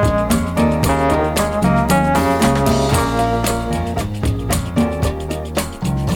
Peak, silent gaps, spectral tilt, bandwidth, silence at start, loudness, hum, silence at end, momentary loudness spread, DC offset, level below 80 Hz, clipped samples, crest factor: 0 dBFS; none; -5.5 dB/octave; 19 kHz; 0 s; -17 LUFS; none; 0 s; 7 LU; under 0.1%; -26 dBFS; under 0.1%; 16 dB